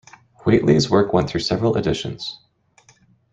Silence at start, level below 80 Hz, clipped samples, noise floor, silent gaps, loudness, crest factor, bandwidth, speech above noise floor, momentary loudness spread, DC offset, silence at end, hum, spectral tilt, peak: 0.45 s; -46 dBFS; under 0.1%; -56 dBFS; none; -19 LUFS; 18 dB; 9.2 kHz; 37 dB; 12 LU; under 0.1%; 1 s; none; -6 dB/octave; -2 dBFS